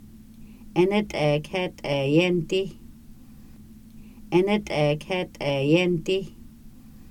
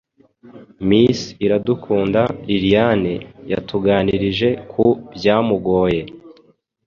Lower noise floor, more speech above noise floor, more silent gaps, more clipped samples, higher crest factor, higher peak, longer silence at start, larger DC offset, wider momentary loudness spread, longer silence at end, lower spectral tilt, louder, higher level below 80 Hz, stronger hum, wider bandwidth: second, -46 dBFS vs -54 dBFS; second, 23 dB vs 37 dB; neither; neither; about the same, 18 dB vs 16 dB; second, -8 dBFS vs -2 dBFS; second, 0 s vs 0.45 s; neither; about the same, 8 LU vs 9 LU; second, 0 s vs 0.55 s; about the same, -6.5 dB/octave vs -7 dB/octave; second, -24 LUFS vs -18 LUFS; about the same, -48 dBFS vs -44 dBFS; neither; first, 16 kHz vs 7.2 kHz